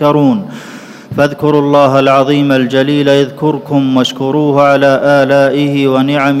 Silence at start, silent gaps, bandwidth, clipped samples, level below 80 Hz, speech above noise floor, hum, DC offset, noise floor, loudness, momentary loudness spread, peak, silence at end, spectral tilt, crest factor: 0 s; none; 13.5 kHz; 0.7%; -54 dBFS; 21 dB; none; under 0.1%; -30 dBFS; -10 LUFS; 8 LU; 0 dBFS; 0 s; -6.5 dB/octave; 10 dB